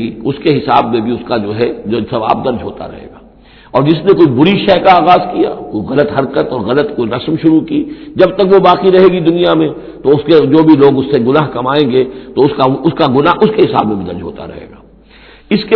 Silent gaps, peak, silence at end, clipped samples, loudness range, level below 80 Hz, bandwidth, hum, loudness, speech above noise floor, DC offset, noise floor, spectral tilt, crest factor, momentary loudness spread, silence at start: none; 0 dBFS; 0 s; 1%; 5 LU; -42 dBFS; 5.4 kHz; none; -11 LUFS; 29 dB; under 0.1%; -40 dBFS; -9 dB/octave; 10 dB; 11 LU; 0 s